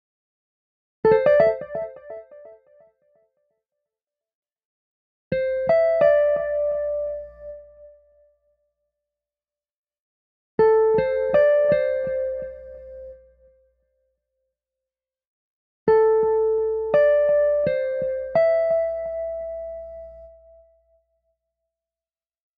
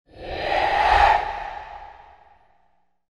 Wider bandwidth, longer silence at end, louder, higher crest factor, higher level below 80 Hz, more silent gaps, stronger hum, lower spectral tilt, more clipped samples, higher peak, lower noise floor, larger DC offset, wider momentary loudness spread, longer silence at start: second, 5 kHz vs 11 kHz; first, 2.3 s vs 1.25 s; about the same, -21 LUFS vs -20 LUFS; about the same, 18 dB vs 20 dB; second, -54 dBFS vs -38 dBFS; first, 4.35-4.42 s, 4.65-5.31 s, 9.77-9.83 s, 10.00-10.58 s, 15.27-15.86 s vs none; neither; first, -8 dB/octave vs -4 dB/octave; neither; about the same, -6 dBFS vs -4 dBFS; first, under -90 dBFS vs -67 dBFS; neither; about the same, 22 LU vs 21 LU; first, 1.05 s vs 0.15 s